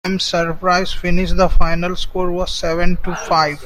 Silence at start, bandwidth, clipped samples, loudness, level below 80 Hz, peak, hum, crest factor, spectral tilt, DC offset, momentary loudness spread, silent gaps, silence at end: 0.05 s; 9.8 kHz; under 0.1%; -18 LUFS; -22 dBFS; 0 dBFS; none; 14 dB; -5 dB/octave; under 0.1%; 5 LU; none; 0 s